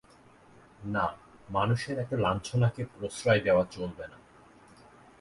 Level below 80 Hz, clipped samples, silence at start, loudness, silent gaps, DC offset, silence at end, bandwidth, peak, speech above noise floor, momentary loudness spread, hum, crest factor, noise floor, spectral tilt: -56 dBFS; under 0.1%; 0.8 s; -30 LUFS; none; under 0.1%; 1.05 s; 11.5 kHz; -10 dBFS; 29 dB; 16 LU; none; 20 dB; -57 dBFS; -6 dB/octave